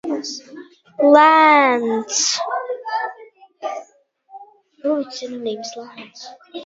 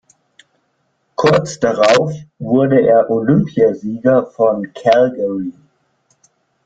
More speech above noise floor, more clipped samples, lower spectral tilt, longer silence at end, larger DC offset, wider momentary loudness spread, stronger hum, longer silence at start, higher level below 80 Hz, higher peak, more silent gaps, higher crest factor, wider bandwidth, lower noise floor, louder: second, 37 dB vs 51 dB; neither; second, -1.5 dB/octave vs -6.5 dB/octave; second, 0 s vs 1.15 s; neither; first, 24 LU vs 10 LU; neither; second, 0.05 s vs 1.2 s; second, -70 dBFS vs -54 dBFS; about the same, 0 dBFS vs 0 dBFS; neither; first, 20 dB vs 14 dB; second, 7.8 kHz vs 9.2 kHz; second, -55 dBFS vs -65 dBFS; second, -17 LUFS vs -14 LUFS